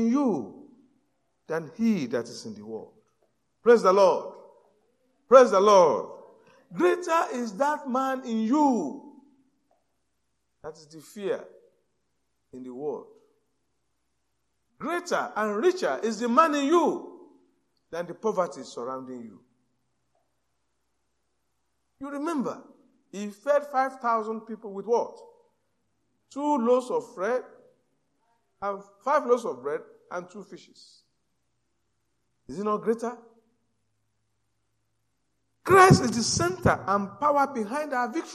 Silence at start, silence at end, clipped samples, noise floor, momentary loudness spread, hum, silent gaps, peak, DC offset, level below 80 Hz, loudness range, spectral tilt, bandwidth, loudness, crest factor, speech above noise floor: 0 s; 0 s; under 0.1%; -78 dBFS; 22 LU; none; none; -2 dBFS; under 0.1%; -64 dBFS; 17 LU; -5.5 dB/octave; 13.5 kHz; -25 LUFS; 26 dB; 54 dB